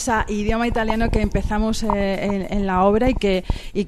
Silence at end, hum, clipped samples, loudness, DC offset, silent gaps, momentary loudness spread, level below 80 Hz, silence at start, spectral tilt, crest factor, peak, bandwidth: 0 s; none; under 0.1%; -21 LUFS; under 0.1%; none; 6 LU; -28 dBFS; 0 s; -6 dB/octave; 16 dB; -4 dBFS; 13.5 kHz